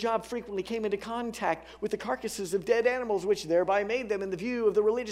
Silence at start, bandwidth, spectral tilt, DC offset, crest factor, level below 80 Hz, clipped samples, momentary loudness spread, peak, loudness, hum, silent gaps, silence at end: 0 s; 15 kHz; -4.5 dB/octave; under 0.1%; 18 dB; -60 dBFS; under 0.1%; 8 LU; -12 dBFS; -30 LUFS; none; none; 0 s